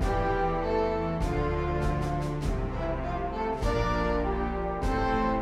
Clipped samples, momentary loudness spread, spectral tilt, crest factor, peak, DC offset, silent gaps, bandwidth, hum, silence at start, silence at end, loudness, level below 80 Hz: under 0.1%; 4 LU; -7 dB/octave; 14 dB; -14 dBFS; under 0.1%; none; 12.5 kHz; none; 0 s; 0 s; -29 LUFS; -34 dBFS